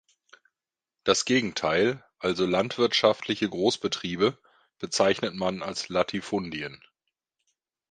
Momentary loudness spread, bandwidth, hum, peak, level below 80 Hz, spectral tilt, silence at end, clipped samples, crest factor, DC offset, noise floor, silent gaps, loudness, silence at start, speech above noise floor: 9 LU; 9.8 kHz; none; -4 dBFS; -62 dBFS; -4 dB/octave; 1.15 s; under 0.1%; 24 dB; under 0.1%; -90 dBFS; none; -26 LUFS; 1.05 s; 64 dB